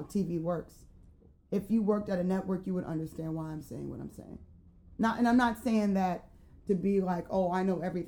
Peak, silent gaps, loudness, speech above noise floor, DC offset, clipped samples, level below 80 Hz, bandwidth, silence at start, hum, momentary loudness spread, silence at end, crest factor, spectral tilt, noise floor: -12 dBFS; none; -32 LUFS; 27 dB; under 0.1%; under 0.1%; -56 dBFS; 18.5 kHz; 0 s; none; 15 LU; 0 s; 20 dB; -7.5 dB/octave; -58 dBFS